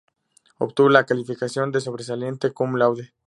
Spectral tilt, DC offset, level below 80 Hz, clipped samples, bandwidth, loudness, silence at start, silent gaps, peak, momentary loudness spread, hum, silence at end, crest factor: -6 dB/octave; under 0.1%; -70 dBFS; under 0.1%; 11.5 kHz; -22 LUFS; 0.6 s; none; 0 dBFS; 13 LU; none; 0.2 s; 22 dB